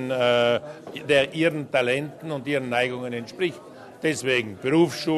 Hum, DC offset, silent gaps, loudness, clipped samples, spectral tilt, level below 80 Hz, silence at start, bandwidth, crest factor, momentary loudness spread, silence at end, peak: none; under 0.1%; none; -24 LUFS; under 0.1%; -5 dB/octave; -64 dBFS; 0 s; 13.5 kHz; 18 dB; 12 LU; 0 s; -6 dBFS